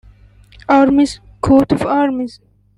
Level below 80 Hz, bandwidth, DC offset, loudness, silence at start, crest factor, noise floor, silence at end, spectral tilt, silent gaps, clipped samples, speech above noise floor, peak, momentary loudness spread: -40 dBFS; 11.5 kHz; under 0.1%; -14 LUFS; 0.7 s; 14 dB; -44 dBFS; 0.5 s; -6.5 dB/octave; none; under 0.1%; 31 dB; -2 dBFS; 13 LU